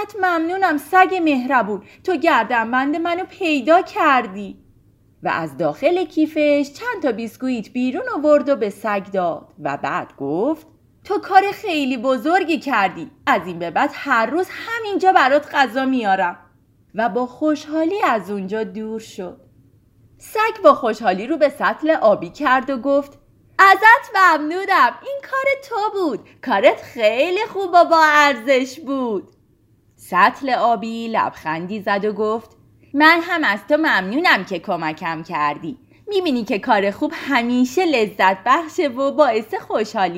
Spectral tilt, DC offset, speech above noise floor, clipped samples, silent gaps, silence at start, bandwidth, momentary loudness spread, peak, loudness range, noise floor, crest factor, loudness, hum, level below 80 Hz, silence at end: -4.5 dB/octave; under 0.1%; 39 dB; under 0.1%; none; 0 s; 16 kHz; 11 LU; 0 dBFS; 6 LU; -57 dBFS; 18 dB; -18 LUFS; none; -62 dBFS; 0 s